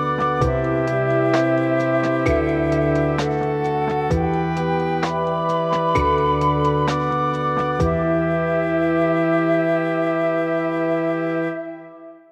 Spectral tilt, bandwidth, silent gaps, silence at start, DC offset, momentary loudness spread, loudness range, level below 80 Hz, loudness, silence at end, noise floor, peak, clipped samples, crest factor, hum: -7.5 dB/octave; 9 kHz; none; 0 s; under 0.1%; 3 LU; 1 LU; -36 dBFS; -20 LUFS; 0.15 s; -41 dBFS; -4 dBFS; under 0.1%; 14 dB; none